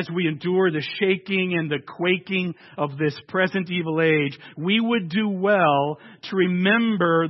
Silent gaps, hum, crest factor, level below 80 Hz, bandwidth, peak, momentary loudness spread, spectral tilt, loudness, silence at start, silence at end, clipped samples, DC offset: none; none; 16 dB; -70 dBFS; 6 kHz; -6 dBFS; 9 LU; -8.5 dB/octave; -22 LUFS; 0 s; 0 s; under 0.1%; under 0.1%